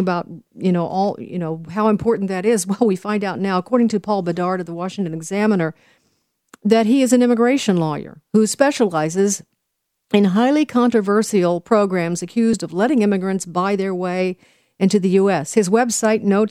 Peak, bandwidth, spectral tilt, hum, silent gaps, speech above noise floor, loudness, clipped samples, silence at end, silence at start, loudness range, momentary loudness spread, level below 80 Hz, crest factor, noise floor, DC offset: -2 dBFS; 15 kHz; -5.5 dB/octave; none; none; 58 dB; -18 LUFS; under 0.1%; 0 s; 0 s; 3 LU; 9 LU; -60 dBFS; 16 dB; -75 dBFS; under 0.1%